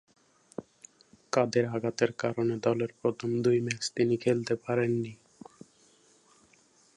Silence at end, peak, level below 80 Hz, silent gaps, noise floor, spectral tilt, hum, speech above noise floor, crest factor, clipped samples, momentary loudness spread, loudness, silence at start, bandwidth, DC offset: 1.8 s; -10 dBFS; -72 dBFS; none; -64 dBFS; -5.5 dB/octave; none; 35 dB; 20 dB; under 0.1%; 16 LU; -29 LUFS; 0.6 s; 11 kHz; under 0.1%